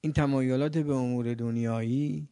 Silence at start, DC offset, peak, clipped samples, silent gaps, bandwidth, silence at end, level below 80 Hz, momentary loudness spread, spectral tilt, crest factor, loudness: 0.05 s; under 0.1%; -12 dBFS; under 0.1%; none; 10.5 kHz; 0.05 s; -54 dBFS; 4 LU; -8 dB/octave; 16 dB; -29 LUFS